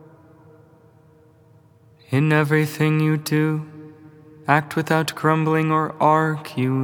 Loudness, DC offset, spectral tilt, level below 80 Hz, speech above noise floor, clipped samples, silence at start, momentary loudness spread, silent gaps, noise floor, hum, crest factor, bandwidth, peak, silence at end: -20 LUFS; under 0.1%; -6.5 dB/octave; -72 dBFS; 33 dB; under 0.1%; 2.1 s; 7 LU; none; -53 dBFS; none; 22 dB; 20 kHz; 0 dBFS; 0 s